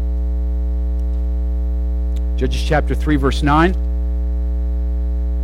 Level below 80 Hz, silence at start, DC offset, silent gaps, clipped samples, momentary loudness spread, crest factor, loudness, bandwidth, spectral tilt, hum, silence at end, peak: -18 dBFS; 0 s; under 0.1%; none; under 0.1%; 7 LU; 14 dB; -19 LUFS; 9.4 kHz; -7 dB/octave; 60 Hz at -20 dBFS; 0 s; -4 dBFS